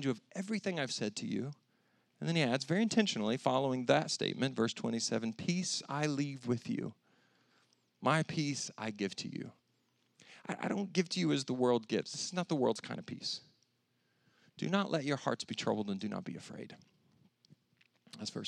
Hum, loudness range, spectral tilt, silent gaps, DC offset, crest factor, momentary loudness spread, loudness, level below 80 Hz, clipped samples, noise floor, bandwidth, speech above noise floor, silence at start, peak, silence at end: none; 5 LU; -4.5 dB/octave; none; under 0.1%; 24 dB; 12 LU; -35 LUFS; -86 dBFS; under 0.1%; -78 dBFS; 11.5 kHz; 43 dB; 0 s; -12 dBFS; 0 s